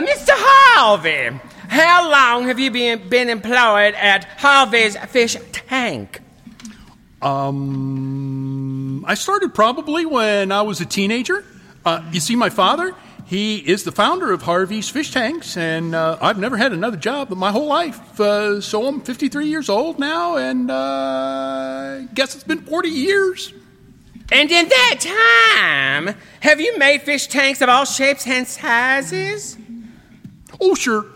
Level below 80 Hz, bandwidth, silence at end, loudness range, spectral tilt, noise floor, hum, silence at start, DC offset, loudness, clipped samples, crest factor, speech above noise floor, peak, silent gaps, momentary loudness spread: -54 dBFS; 16.5 kHz; 0.05 s; 8 LU; -3.5 dB/octave; -46 dBFS; none; 0 s; under 0.1%; -16 LUFS; under 0.1%; 18 dB; 29 dB; 0 dBFS; none; 13 LU